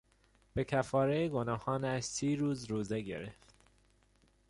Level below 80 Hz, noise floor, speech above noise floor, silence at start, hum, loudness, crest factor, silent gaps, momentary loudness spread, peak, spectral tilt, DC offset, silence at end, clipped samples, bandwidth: -60 dBFS; -69 dBFS; 35 dB; 0.55 s; 50 Hz at -65 dBFS; -35 LUFS; 20 dB; none; 11 LU; -18 dBFS; -5.5 dB/octave; under 0.1%; 1.15 s; under 0.1%; 11.5 kHz